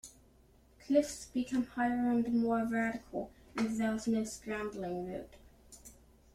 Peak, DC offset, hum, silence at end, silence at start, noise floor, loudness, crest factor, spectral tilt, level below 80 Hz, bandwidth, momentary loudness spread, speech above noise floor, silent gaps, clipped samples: -16 dBFS; under 0.1%; none; 0.45 s; 0.05 s; -64 dBFS; -34 LUFS; 20 dB; -5 dB/octave; -62 dBFS; 14.5 kHz; 15 LU; 30 dB; none; under 0.1%